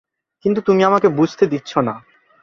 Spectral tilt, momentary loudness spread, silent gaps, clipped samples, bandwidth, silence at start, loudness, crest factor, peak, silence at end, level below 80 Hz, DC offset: -7 dB/octave; 10 LU; none; under 0.1%; 7.2 kHz; 0.45 s; -17 LUFS; 16 dB; -2 dBFS; 0.45 s; -58 dBFS; under 0.1%